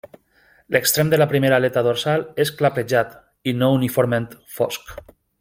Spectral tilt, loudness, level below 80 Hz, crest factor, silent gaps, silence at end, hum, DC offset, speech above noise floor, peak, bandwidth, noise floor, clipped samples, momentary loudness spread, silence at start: -5 dB/octave; -20 LUFS; -56 dBFS; 20 dB; none; 0.4 s; none; under 0.1%; 38 dB; 0 dBFS; 16.5 kHz; -57 dBFS; under 0.1%; 11 LU; 0.7 s